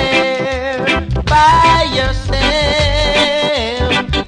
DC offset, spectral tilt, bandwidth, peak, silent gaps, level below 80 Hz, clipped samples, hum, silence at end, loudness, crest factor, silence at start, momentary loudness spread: under 0.1%; -4.5 dB/octave; 10.5 kHz; 0 dBFS; none; -22 dBFS; under 0.1%; none; 0 s; -13 LUFS; 12 dB; 0 s; 7 LU